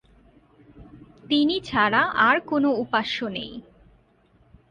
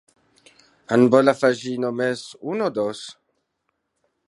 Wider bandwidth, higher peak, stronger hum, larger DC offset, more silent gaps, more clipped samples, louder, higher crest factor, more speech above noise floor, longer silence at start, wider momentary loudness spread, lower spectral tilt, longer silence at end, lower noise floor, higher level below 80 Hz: second, 9.6 kHz vs 11.5 kHz; about the same, -4 dBFS vs -2 dBFS; neither; neither; neither; neither; about the same, -22 LUFS vs -21 LUFS; about the same, 20 dB vs 22 dB; second, 37 dB vs 55 dB; second, 0.75 s vs 0.9 s; about the same, 13 LU vs 14 LU; about the same, -5.5 dB/octave vs -6 dB/octave; about the same, 1.1 s vs 1.15 s; second, -60 dBFS vs -75 dBFS; first, -58 dBFS vs -70 dBFS